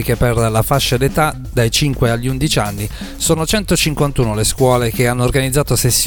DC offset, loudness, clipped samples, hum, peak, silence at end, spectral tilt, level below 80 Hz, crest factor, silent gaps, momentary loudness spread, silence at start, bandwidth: under 0.1%; -15 LUFS; under 0.1%; none; 0 dBFS; 0 s; -4.5 dB/octave; -28 dBFS; 14 dB; none; 3 LU; 0 s; 19 kHz